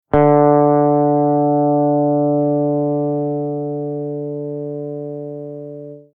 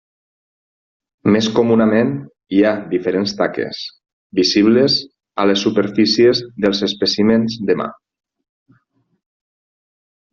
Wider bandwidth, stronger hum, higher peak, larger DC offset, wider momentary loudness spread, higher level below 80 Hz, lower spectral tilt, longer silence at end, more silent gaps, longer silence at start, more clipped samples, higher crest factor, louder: second, 3.3 kHz vs 7.2 kHz; neither; about the same, -2 dBFS vs -2 dBFS; neither; first, 17 LU vs 11 LU; first, -48 dBFS vs -56 dBFS; first, -13 dB/octave vs -4 dB/octave; second, 0.15 s vs 2.4 s; second, none vs 4.13-4.30 s; second, 0.15 s vs 1.25 s; neither; about the same, 14 dB vs 16 dB; about the same, -17 LUFS vs -16 LUFS